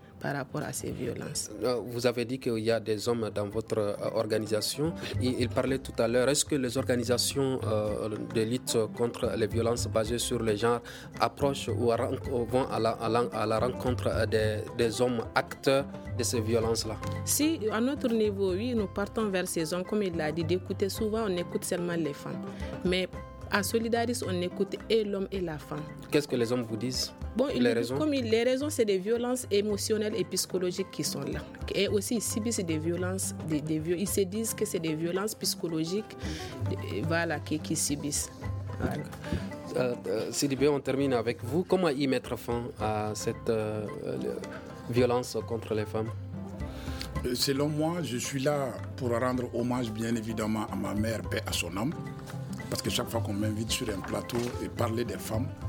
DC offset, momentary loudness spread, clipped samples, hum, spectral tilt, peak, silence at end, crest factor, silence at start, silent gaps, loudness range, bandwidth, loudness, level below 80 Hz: under 0.1%; 7 LU; under 0.1%; none; -4.5 dB/octave; -8 dBFS; 0 s; 22 dB; 0 s; none; 4 LU; over 20 kHz; -30 LUFS; -50 dBFS